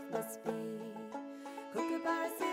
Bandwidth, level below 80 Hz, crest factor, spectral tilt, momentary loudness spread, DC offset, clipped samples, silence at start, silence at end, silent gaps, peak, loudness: 16 kHz; -84 dBFS; 18 dB; -4.5 dB/octave; 10 LU; under 0.1%; under 0.1%; 0 s; 0 s; none; -22 dBFS; -40 LUFS